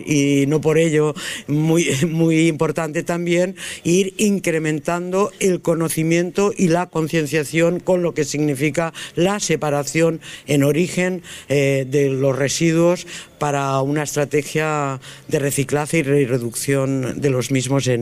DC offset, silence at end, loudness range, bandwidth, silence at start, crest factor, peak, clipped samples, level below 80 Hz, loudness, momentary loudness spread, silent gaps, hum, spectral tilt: under 0.1%; 0 s; 2 LU; 15.5 kHz; 0 s; 14 dB; -6 dBFS; under 0.1%; -52 dBFS; -19 LUFS; 6 LU; none; none; -5.5 dB/octave